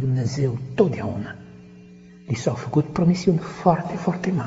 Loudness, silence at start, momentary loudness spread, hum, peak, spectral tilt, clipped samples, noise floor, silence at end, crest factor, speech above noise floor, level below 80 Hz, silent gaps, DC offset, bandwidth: -23 LUFS; 0 s; 10 LU; 60 Hz at -40 dBFS; -2 dBFS; -7.5 dB/octave; under 0.1%; -45 dBFS; 0 s; 20 dB; 23 dB; -52 dBFS; none; under 0.1%; 8 kHz